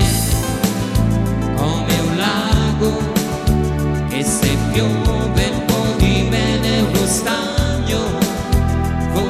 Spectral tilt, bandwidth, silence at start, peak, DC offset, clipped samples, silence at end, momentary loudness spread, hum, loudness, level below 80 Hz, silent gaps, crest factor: -5 dB/octave; 16 kHz; 0 s; -4 dBFS; under 0.1%; under 0.1%; 0 s; 3 LU; none; -17 LUFS; -24 dBFS; none; 14 dB